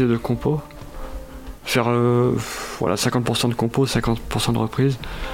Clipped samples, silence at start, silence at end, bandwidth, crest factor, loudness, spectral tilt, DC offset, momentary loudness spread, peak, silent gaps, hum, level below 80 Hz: under 0.1%; 0 s; 0 s; 16.5 kHz; 16 dB; -21 LUFS; -5.5 dB/octave; under 0.1%; 18 LU; -4 dBFS; none; none; -38 dBFS